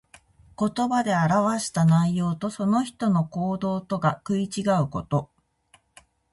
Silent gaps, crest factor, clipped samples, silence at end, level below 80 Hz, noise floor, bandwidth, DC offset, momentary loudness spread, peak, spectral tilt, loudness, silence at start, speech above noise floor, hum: none; 16 dB; under 0.1%; 1.1 s; -56 dBFS; -62 dBFS; 11.5 kHz; under 0.1%; 7 LU; -8 dBFS; -6.5 dB/octave; -24 LUFS; 0.6 s; 38 dB; none